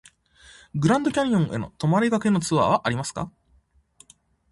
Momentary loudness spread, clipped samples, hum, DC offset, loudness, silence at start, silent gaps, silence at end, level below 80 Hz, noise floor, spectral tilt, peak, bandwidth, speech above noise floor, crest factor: 11 LU; under 0.1%; none; under 0.1%; -23 LUFS; 0.75 s; none; 1.25 s; -54 dBFS; -62 dBFS; -6 dB/octave; -6 dBFS; 11.5 kHz; 40 dB; 18 dB